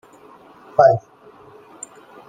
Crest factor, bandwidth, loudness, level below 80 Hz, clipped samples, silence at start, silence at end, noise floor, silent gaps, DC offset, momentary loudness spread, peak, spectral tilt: 20 dB; 9.4 kHz; -17 LUFS; -64 dBFS; under 0.1%; 0.8 s; 1.3 s; -46 dBFS; none; under 0.1%; 23 LU; -2 dBFS; -5.5 dB/octave